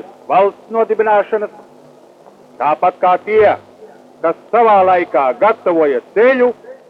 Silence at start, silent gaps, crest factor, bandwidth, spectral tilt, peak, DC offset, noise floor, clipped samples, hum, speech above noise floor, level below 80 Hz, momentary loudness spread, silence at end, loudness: 0.3 s; none; 12 dB; 5.8 kHz; -7 dB/octave; -2 dBFS; under 0.1%; -43 dBFS; under 0.1%; none; 30 dB; -64 dBFS; 9 LU; 0.15 s; -14 LUFS